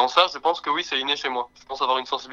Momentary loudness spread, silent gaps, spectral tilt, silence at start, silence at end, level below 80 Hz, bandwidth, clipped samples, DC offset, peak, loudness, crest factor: 9 LU; none; -1.5 dB/octave; 0 s; 0 s; -64 dBFS; 11 kHz; under 0.1%; under 0.1%; -2 dBFS; -23 LUFS; 22 dB